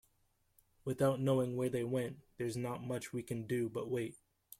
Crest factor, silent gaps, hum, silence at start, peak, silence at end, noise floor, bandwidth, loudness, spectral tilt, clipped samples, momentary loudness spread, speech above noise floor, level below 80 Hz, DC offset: 18 dB; none; none; 0.85 s; -22 dBFS; 0.45 s; -76 dBFS; 16 kHz; -38 LUFS; -6.5 dB/octave; under 0.1%; 10 LU; 39 dB; -70 dBFS; under 0.1%